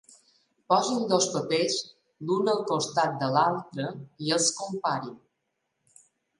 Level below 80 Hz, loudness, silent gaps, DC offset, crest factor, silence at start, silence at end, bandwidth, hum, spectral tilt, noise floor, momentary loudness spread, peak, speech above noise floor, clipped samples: -76 dBFS; -27 LUFS; none; under 0.1%; 20 dB; 0.7 s; 1.2 s; 11.5 kHz; none; -3.5 dB/octave; -79 dBFS; 10 LU; -8 dBFS; 53 dB; under 0.1%